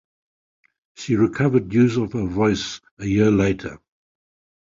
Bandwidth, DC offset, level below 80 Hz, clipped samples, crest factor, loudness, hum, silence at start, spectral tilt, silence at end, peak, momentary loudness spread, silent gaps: 7.6 kHz; under 0.1%; -46 dBFS; under 0.1%; 16 dB; -20 LUFS; none; 1 s; -6.5 dB/octave; 0.9 s; -6 dBFS; 13 LU; 2.91-2.97 s